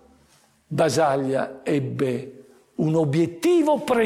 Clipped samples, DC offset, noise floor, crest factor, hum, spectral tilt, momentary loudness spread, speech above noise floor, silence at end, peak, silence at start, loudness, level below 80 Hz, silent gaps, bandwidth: under 0.1%; under 0.1%; -59 dBFS; 12 dB; none; -6.5 dB/octave; 11 LU; 38 dB; 0 s; -10 dBFS; 0.7 s; -22 LUFS; -62 dBFS; none; 16 kHz